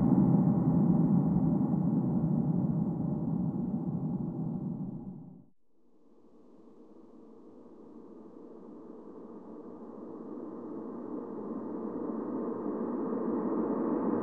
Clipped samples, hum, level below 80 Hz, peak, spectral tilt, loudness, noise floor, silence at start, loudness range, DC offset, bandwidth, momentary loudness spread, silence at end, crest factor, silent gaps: under 0.1%; none; -58 dBFS; -14 dBFS; -13.5 dB/octave; -31 LUFS; -70 dBFS; 0 s; 23 LU; under 0.1%; 2.2 kHz; 23 LU; 0 s; 18 dB; none